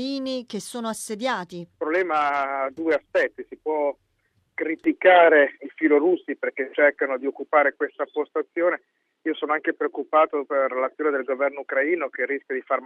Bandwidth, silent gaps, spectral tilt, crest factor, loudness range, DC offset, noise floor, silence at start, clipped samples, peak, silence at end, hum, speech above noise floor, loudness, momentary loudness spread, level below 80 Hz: 13.5 kHz; none; -4 dB/octave; 20 dB; 5 LU; under 0.1%; -69 dBFS; 0 s; under 0.1%; -4 dBFS; 0 s; none; 46 dB; -23 LUFS; 11 LU; -74 dBFS